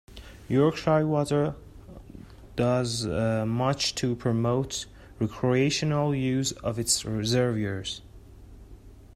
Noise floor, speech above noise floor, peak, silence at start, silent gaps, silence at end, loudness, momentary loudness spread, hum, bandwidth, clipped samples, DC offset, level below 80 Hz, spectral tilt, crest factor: -48 dBFS; 22 dB; -10 dBFS; 0.1 s; none; 0.1 s; -26 LUFS; 16 LU; none; 15 kHz; under 0.1%; under 0.1%; -50 dBFS; -5 dB/octave; 18 dB